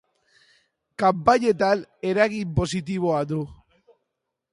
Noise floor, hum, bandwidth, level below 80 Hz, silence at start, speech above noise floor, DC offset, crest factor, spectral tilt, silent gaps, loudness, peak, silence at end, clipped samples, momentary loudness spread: -81 dBFS; none; 11.5 kHz; -48 dBFS; 1 s; 59 dB; under 0.1%; 22 dB; -6 dB/octave; none; -23 LUFS; -4 dBFS; 1 s; under 0.1%; 10 LU